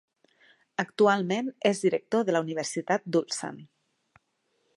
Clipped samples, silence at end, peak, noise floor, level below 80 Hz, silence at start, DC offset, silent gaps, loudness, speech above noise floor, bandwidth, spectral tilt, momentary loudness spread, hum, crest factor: under 0.1%; 1.1 s; -8 dBFS; -75 dBFS; -80 dBFS; 0.8 s; under 0.1%; none; -27 LUFS; 48 dB; 11.5 kHz; -4.5 dB/octave; 11 LU; none; 22 dB